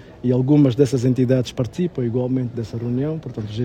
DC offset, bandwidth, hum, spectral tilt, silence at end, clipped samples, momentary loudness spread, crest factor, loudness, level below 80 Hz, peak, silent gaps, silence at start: under 0.1%; 10 kHz; none; -8 dB/octave; 0 s; under 0.1%; 11 LU; 18 dB; -20 LUFS; -50 dBFS; -2 dBFS; none; 0 s